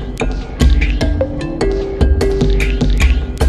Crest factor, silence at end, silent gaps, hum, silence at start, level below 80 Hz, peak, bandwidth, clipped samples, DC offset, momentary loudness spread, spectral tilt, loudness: 14 dB; 0 s; none; none; 0 s; -16 dBFS; 0 dBFS; 12.5 kHz; under 0.1%; under 0.1%; 6 LU; -6.5 dB/octave; -16 LUFS